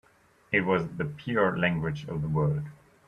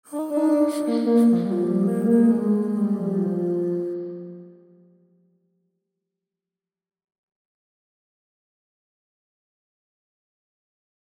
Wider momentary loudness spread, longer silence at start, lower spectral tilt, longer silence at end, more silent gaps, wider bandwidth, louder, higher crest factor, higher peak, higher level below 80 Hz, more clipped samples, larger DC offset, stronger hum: second, 9 LU vs 12 LU; first, 0.5 s vs 0.1 s; about the same, -8 dB/octave vs -8.5 dB/octave; second, 0.35 s vs 6.6 s; neither; second, 6.6 kHz vs 15.5 kHz; second, -28 LUFS vs -22 LUFS; about the same, 20 dB vs 18 dB; about the same, -10 dBFS vs -8 dBFS; first, -56 dBFS vs -78 dBFS; neither; neither; neither